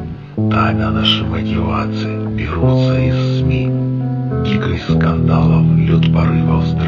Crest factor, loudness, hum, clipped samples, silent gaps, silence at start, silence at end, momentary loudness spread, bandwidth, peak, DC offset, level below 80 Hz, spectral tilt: 14 dB; -15 LUFS; none; under 0.1%; none; 0 s; 0 s; 7 LU; 7 kHz; 0 dBFS; under 0.1%; -32 dBFS; -8 dB/octave